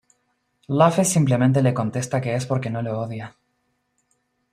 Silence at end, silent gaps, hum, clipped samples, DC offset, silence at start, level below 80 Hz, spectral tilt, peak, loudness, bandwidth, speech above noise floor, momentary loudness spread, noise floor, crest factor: 1.25 s; none; none; under 0.1%; under 0.1%; 0.7 s; -60 dBFS; -6 dB/octave; -4 dBFS; -21 LUFS; 14.5 kHz; 51 dB; 12 LU; -71 dBFS; 20 dB